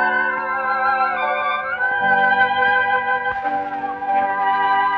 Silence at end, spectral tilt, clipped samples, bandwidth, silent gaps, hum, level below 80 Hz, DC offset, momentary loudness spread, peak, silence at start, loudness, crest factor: 0 s; -5.5 dB/octave; under 0.1%; 5.2 kHz; none; none; -58 dBFS; under 0.1%; 7 LU; -4 dBFS; 0 s; -18 LUFS; 14 dB